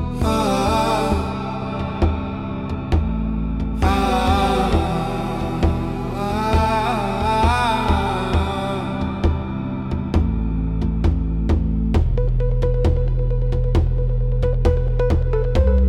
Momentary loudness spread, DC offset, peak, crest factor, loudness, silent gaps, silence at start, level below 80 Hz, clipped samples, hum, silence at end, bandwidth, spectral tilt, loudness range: 7 LU; under 0.1%; -4 dBFS; 14 dB; -21 LUFS; none; 0 s; -22 dBFS; under 0.1%; none; 0 s; 13 kHz; -7 dB/octave; 2 LU